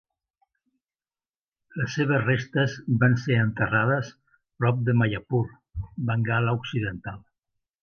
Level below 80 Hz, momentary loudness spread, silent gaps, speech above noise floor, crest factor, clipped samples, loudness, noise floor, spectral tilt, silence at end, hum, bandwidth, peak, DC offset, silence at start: -52 dBFS; 15 LU; none; over 66 dB; 18 dB; under 0.1%; -25 LUFS; under -90 dBFS; -7.5 dB/octave; 0.65 s; none; 6.8 kHz; -8 dBFS; under 0.1%; 1.75 s